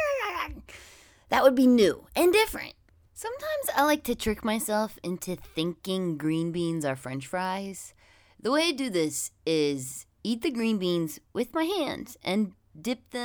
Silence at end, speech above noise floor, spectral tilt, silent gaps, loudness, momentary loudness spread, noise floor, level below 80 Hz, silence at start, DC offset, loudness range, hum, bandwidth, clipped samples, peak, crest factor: 0 s; 27 dB; -4.5 dB/octave; none; -28 LUFS; 14 LU; -54 dBFS; -54 dBFS; 0 s; under 0.1%; 6 LU; none; over 20 kHz; under 0.1%; -6 dBFS; 22 dB